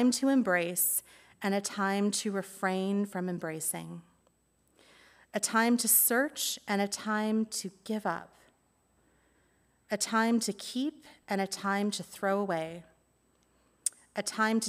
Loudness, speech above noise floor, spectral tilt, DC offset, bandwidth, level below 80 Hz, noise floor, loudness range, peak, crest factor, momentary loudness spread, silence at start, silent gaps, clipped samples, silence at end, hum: -30 LUFS; 40 dB; -3 dB/octave; under 0.1%; 16 kHz; -76 dBFS; -71 dBFS; 6 LU; -12 dBFS; 20 dB; 11 LU; 0 s; none; under 0.1%; 0 s; none